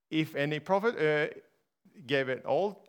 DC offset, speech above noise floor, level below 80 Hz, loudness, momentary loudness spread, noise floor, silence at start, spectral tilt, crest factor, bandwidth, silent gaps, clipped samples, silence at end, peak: under 0.1%; 34 dB; -86 dBFS; -30 LUFS; 5 LU; -64 dBFS; 0.1 s; -6.5 dB/octave; 18 dB; 19 kHz; none; under 0.1%; 0.15 s; -12 dBFS